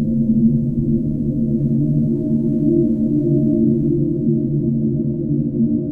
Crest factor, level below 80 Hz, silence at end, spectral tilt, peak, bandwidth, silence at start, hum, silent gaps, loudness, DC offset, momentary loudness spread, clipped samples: 12 dB; -36 dBFS; 0 s; -14 dB/octave; -4 dBFS; 1 kHz; 0 s; none; none; -18 LUFS; under 0.1%; 4 LU; under 0.1%